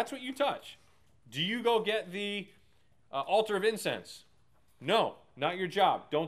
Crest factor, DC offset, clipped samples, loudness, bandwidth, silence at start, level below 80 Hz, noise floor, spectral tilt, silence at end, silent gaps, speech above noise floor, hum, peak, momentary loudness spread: 20 dB; under 0.1%; under 0.1%; -32 LUFS; 15 kHz; 0 s; -76 dBFS; -70 dBFS; -4 dB/octave; 0 s; none; 38 dB; none; -14 dBFS; 14 LU